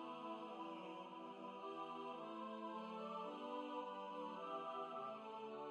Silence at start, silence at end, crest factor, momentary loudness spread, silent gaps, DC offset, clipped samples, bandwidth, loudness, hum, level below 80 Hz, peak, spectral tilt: 0 s; 0 s; 14 dB; 4 LU; none; under 0.1%; under 0.1%; 10.5 kHz; -50 LUFS; none; under -90 dBFS; -36 dBFS; -6 dB/octave